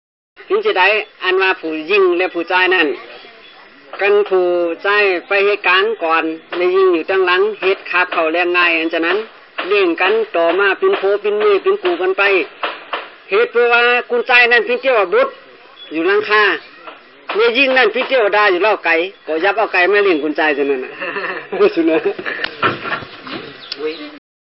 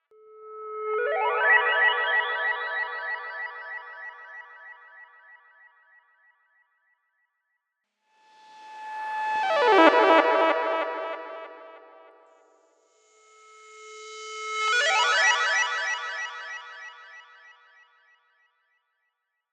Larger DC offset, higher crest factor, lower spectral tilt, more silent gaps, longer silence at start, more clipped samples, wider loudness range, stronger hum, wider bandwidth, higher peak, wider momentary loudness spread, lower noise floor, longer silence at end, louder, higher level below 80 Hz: first, 0.1% vs under 0.1%; second, 14 dB vs 28 dB; about the same, 0 dB/octave vs 0.5 dB/octave; neither; about the same, 0.4 s vs 0.35 s; neither; second, 2 LU vs 20 LU; neither; second, 5.8 kHz vs 10.5 kHz; about the same, -2 dBFS vs 0 dBFS; second, 12 LU vs 24 LU; second, -41 dBFS vs -80 dBFS; second, 0.25 s vs 2.3 s; first, -14 LUFS vs -23 LUFS; first, -66 dBFS vs under -90 dBFS